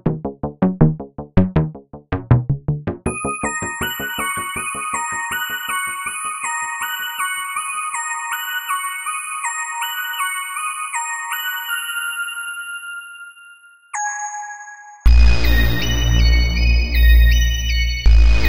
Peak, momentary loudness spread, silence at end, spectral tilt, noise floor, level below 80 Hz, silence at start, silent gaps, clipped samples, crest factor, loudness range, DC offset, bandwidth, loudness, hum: 0 dBFS; 12 LU; 0 s; -4 dB/octave; -45 dBFS; -20 dBFS; 0 s; none; under 0.1%; 18 dB; 8 LU; under 0.1%; 15.5 kHz; -20 LUFS; none